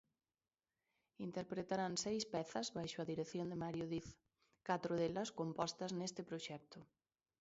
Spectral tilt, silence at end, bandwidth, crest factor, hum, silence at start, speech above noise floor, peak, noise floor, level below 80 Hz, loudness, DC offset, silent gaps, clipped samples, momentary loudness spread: -4.5 dB/octave; 0.55 s; 7.6 kHz; 20 dB; none; 1.2 s; over 46 dB; -26 dBFS; under -90 dBFS; -76 dBFS; -44 LUFS; under 0.1%; none; under 0.1%; 11 LU